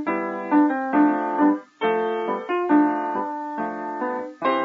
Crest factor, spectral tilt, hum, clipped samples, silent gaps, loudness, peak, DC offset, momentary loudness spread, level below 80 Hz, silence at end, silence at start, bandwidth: 14 dB; -7.5 dB/octave; none; under 0.1%; none; -23 LUFS; -8 dBFS; under 0.1%; 9 LU; -80 dBFS; 0 s; 0 s; 4.6 kHz